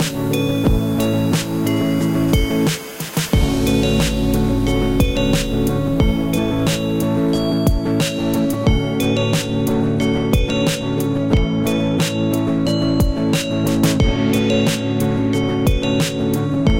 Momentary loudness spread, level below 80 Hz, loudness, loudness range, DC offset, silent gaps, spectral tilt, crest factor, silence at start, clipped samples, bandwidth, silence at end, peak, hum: 2 LU; -26 dBFS; -18 LUFS; 1 LU; 0.5%; none; -6 dB/octave; 14 dB; 0 s; under 0.1%; 17 kHz; 0 s; -2 dBFS; none